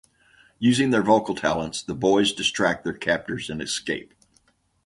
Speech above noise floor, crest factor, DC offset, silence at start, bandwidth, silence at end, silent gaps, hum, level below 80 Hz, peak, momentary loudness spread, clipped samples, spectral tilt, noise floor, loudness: 41 dB; 20 dB; under 0.1%; 0.6 s; 11.5 kHz; 0.85 s; none; none; -54 dBFS; -4 dBFS; 10 LU; under 0.1%; -4 dB/octave; -64 dBFS; -23 LUFS